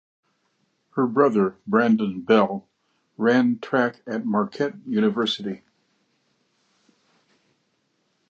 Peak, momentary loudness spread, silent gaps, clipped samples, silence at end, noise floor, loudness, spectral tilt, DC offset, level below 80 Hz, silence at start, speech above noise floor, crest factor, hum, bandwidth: -4 dBFS; 10 LU; none; under 0.1%; 2.75 s; -70 dBFS; -22 LUFS; -6.5 dB/octave; under 0.1%; -70 dBFS; 0.95 s; 49 dB; 20 dB; none; 7.6 kHz